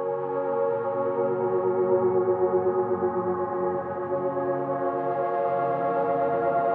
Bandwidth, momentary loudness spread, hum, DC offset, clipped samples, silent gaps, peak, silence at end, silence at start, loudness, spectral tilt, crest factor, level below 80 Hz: 3.8 kHz; 4 LU; none; under 0.1%; under 0.1%; none; -12 dBFS; 0 s; 0 s; -26 LUFS; -11 dB/octave; 12 dB; -72 dBFS